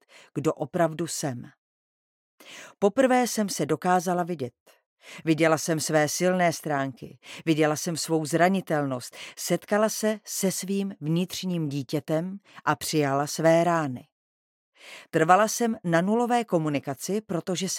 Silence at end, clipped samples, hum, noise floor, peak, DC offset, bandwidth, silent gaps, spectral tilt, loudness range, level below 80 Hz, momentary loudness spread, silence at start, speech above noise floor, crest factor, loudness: 0 s; under 0.1%; none; under -90 dBFS; -4 dBFS; under 0.1%; 17 kHz; 1.58-2.38 s, 4.60-4.66 s, 4.86-4.97 s, 14.12-14.72 s; -4.5 dB/octave; 3 LU; -74 dBFS; 12 LU; 0.35 s; over 64 dB; 22 dB; -26 LUFS